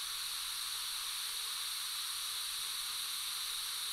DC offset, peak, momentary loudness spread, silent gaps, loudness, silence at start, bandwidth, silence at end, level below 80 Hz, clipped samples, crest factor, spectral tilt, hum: under 0.1%; -26 dBFS; 0 LU; none; -37 LUFS; 0 s; 16 kHz; 0 s; -72 dBFS; under 0.1%; 14 dB; 4 dB/octave; none